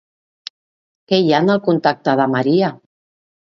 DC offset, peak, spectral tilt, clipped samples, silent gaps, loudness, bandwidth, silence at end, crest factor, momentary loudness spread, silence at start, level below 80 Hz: under 0.1%; -2 dBFS; -7 dB/octave; under 0.1%; none; -16 LUFS; 7.4 kHz; 0.7 s; 16 dB; 21 LU; 1.1 s; -64 dBFS